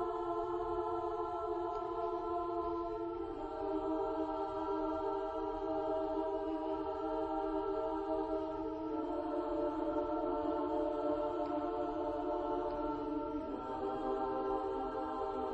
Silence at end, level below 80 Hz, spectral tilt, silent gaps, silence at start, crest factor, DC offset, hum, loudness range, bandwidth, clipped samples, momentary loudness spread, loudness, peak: 0 s; -58 dBFS; -8 dB/octave; none; 0 s; 14 dB; under 0.1%; none; 2 LU; 8 kHz; under 0.1%; 3 LU; -38 LUFS; -24 dBFS